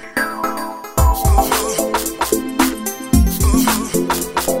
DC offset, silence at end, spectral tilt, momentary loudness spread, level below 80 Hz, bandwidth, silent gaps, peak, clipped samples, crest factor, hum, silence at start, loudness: under 0.1%; 0 s; -4.5 dB/octave; 7 LU; -22 dBFS; 16.5 kHz; none; 0 dBFS; under 0.1%; 16 dB; none; 0 s; -17 LUFS